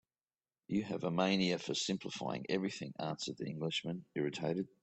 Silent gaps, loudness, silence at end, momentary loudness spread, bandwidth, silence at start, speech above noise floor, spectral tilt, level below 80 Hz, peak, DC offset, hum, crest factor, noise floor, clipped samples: none; -38 LUFS; 0.15 s; 8 LU; 8.4 kHz; 0.7 s; over 53 dB; -5 dB/octave; -76 dBFS; -18 dBFS; under 0.1%; none; 20 dB; under -90 dBFS; under 0.1%